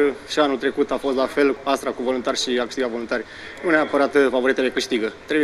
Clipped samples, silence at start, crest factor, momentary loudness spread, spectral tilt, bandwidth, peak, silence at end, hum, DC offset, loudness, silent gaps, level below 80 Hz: under 0.1%; 0 s; 16 dB; 8 LU; -3.5 dB/octave; 13.5 kHz; -4 dBFS; 0 s; none; under 0.1%; -21 LUFS; none; -54 dBFS